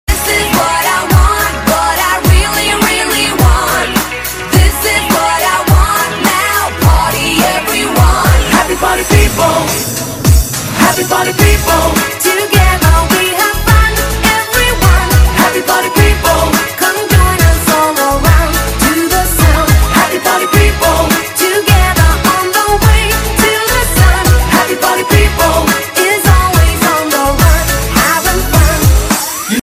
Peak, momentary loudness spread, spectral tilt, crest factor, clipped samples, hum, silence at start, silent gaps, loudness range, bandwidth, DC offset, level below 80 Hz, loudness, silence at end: 0 dBFS; 3 LU; -4 dB/octave; 10 dB; 0.5%; none; 0.1 s; none; 1 LU; 16 kHz; under 0.1%; -14 dBFS; -10 LUFS; 0.05 s